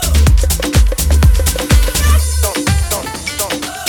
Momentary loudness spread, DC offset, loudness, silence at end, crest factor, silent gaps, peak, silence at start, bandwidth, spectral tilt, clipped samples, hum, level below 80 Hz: 7 LU; under 0.1%; -13 LUFS; 0 s; 12 dB; none; 0 dBFS; 0 s; over 20 kHz; -4 dB/octave; under 0.1%; none; -14 dBFS